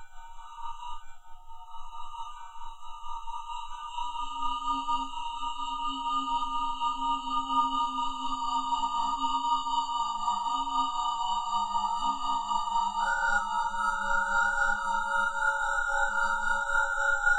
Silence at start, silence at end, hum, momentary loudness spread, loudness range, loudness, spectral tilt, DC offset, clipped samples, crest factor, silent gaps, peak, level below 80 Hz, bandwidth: 0 s; 0 s; none; 15 LU; 12 LU; -29 LUFS; -1.5 dB/octave; under 0.1%; under 0.1%; 16 dB; none; -14 dBFS; -44 dBFS; 9.4 kHz